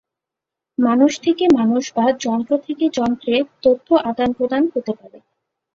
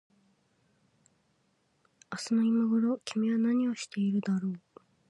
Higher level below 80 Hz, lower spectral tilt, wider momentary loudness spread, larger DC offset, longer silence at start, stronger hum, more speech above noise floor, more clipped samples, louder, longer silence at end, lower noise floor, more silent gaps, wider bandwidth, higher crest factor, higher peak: first, -56 dBFS vs -80 dBFS; about the same, -5 dB/octave vs -6 dB/octave; second, 6 LU vs 12 LU; neither; second, 0.8 s vs 2.1 s; neither; first, 68 dB vs 44 dB; neither; first, -18 LUFS vs -30 LUFS; about the same, 0.55 s vs 0.5 s; first, -85 dBFS vs -73 dBFS; neither; second, 7.6 kHz vs 11.5 kHz; about the same, 16 dB vs 12 dB; first, -2 dBFS vs -18 dBFS